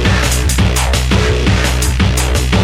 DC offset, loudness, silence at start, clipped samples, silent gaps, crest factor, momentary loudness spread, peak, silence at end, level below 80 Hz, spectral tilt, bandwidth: under 0.1%; -13 LUFS; 0 s; under 0.1%; none; 12 dB; 1 LU; 0 dBFS; 0 s; -16 dBFS; -4.5 dB/octave; 16.5 kHz